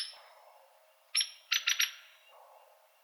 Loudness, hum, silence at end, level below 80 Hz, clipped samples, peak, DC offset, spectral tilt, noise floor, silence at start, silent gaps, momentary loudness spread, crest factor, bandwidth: -31 LUFS; none; 1 s; under -90 dBFS; under 0.1%; -12 dBFS; under 0.1%; 9.5 dB/octave; -65 dBFS; 0 s; none; 20 LU; 26 dB; over 20 kHz